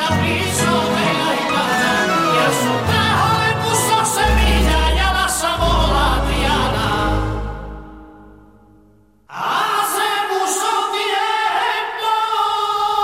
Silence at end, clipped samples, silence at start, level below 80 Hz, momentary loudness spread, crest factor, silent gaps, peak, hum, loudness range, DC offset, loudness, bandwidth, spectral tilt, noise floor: 0 s; under 0.1%; 0 s; -26 dBFS; 5 LU; 14 dB; none; -4 dBFS; none; 7 LU; 0.1%; -17 LUFS; 16 kHz; -3.5 dB/octave; -52 dBFS